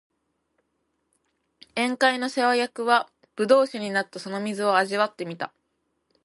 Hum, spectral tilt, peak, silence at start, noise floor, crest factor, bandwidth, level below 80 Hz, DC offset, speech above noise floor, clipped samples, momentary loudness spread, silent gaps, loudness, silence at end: none; -4 dB/octave; -4 dBFS; 1.75 s; -75 dBFS; 22 dB; 11.5 kHz; -78 dBFS; under 0.1%; 51 dB; under 0.1%; 12 LU; none; -24 LUFS; 0.8 s